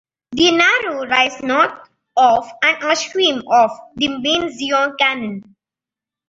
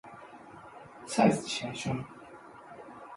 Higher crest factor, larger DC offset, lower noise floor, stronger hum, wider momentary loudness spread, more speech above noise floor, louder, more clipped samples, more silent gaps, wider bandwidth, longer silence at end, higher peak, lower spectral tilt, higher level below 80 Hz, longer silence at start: second, 16 dB vs 24 dB; neither; first, -88 dBFS vs -50 dBFS; neither; second, 8 LU vs 24 LU; first, 72 dB vs 21 dB; first, -16 LUFS vs -30 LUFS; neither; neither; second, 7.8 kHz vs 11.5 kHz; first, 0.85 s vs 0 s; first, -2 dBFS vs -10 dBFS; second, -2.5 dB/octave vs -5 dB/octave; first, -56 dBFS vs -66 dBFS; first, 0.3 s vs 0.05 s